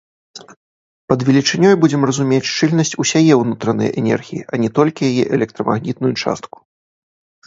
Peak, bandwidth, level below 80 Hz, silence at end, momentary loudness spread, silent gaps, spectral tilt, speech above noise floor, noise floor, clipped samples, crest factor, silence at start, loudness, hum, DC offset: 0 dBFS; 8 kHz; -56 dBFS; 1 s; 8 LU; 0.57-1.08 s; -5.5 dB/octave; over 75 dB; under -90 dBFS; under 0.1%; 16 dB; 0.35 s; -16 LUFS; none; under 0.1%